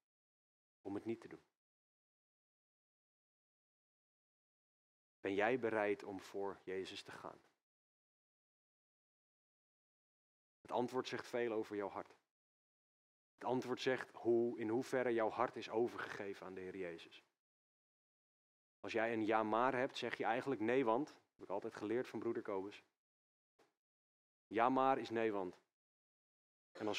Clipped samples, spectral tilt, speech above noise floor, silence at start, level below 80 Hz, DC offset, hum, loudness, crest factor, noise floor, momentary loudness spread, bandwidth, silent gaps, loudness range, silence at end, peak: under 0.1%; -5.5 dB/octave; over 50 dB; 0.85 s; under -90 dBFS; under 0.1%; none; -41 LUFS; 24 dB; under -90 dBFS; 13 LU; 13 kHz; 1.57-5.23 s, 7.63-10.64 s, 12.31-13.38 s, 17.39-18.83 s, 22.97-23.59 s, 23.77-24.51 s, 25.73-26.75 s; 12 LU; 0 s; -20 dBFS